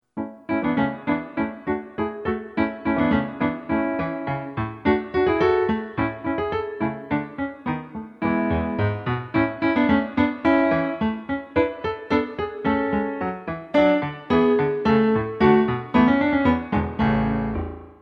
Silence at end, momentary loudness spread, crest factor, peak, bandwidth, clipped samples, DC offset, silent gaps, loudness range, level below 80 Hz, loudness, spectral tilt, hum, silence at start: 0.1 s; 10 LU; 18 dB; -4 dBFS; 6.2 kHz; under 0.1%; under 0.1%; none; 5 LU; -44 dBFS; -23 LUFS; -9 dB/octave; none; 0.15 s